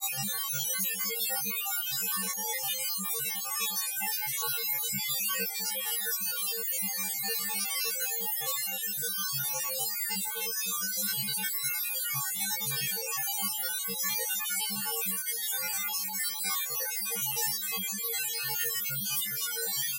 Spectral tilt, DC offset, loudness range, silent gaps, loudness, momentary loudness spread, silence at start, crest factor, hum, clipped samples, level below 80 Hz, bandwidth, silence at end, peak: 0 dB/octave; under 0.1%; 0 LU; none; -29 LUFS; 2 LU; 0 s; 16 dB; none; under 0.1%; -90 dBFS; 16 kHz; 0 s; -18 dBFS